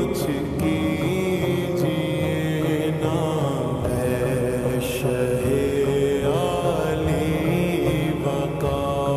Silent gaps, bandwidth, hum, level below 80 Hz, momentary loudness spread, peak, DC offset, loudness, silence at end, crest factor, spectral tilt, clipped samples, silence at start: none; 14.5 kHz; none; -40 dBFS; 3 LU; -10 dBFS; under 0.1%; -23 LUFS; 0 s; 12 dB; -6.5 dB/octave; under 0.1%; 0 s